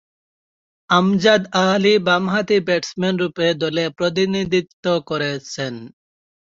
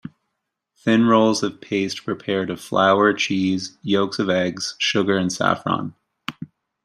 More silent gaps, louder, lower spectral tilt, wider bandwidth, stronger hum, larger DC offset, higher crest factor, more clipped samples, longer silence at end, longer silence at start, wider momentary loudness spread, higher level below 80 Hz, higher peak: first, 4.73-4.83 s vs none; about the same, -18 LUFS vs -20 LUFS; about the same, -5 dB/octave vs -4.5 dB/octave; second, 7.6 kHz vs 13 kHz; neither; neither; about the same, 18 dB vs 18 dB; neither; first, 0.7 s vs 0.4 s; first, 0.9 s vs 0.05 s; second, 9 LU vs 17 LU; first, -58 dBFS vs -64 dBFS; about the same, -2 dBFS vs -4 dBFS